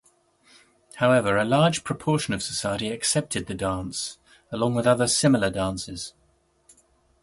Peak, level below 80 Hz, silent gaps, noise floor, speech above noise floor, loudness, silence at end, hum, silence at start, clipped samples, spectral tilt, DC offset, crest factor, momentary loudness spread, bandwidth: -6 dBFS; -52 dBFS; none; -65 dBFS; 41 dB; -24 LUFS; 1.15 s; none; 0.95 s; under 0.1%; -4.5 dB/octave; under 0.1%; 20 dB; 12 LU; 11.5 kHz